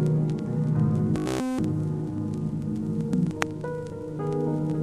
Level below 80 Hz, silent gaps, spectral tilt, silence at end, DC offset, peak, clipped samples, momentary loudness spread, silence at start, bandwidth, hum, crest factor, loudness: -50 dBFS; none; -8 dB/octave; 0 s; under 0.1%; -4 dBFS; under 0.1%; 7 LU; 0 s; 12 kHz; none; 24 dB; -28 LUFS